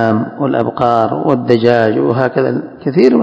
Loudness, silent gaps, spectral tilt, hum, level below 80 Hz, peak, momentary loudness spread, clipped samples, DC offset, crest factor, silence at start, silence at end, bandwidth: -13 LUFS; none; -8.5 dB/octave; none; -52 dBFS; 0 dBFS; 6 LU; 0.6%; under 0.1%; 12 dB; 0 s; 0 s; 8 kHz